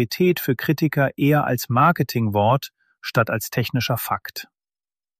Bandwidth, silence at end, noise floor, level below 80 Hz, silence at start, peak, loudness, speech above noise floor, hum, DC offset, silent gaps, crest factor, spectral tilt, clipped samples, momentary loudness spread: 15 kHz; 0.75 s; under -90 dBFS; -58 dBFS; 0 s; -4 dBFS; -21 LUFS; over 70 dB; none; under 0.1%; none; 16 dB; -6 dB/octave; under 0.1%; 9 LU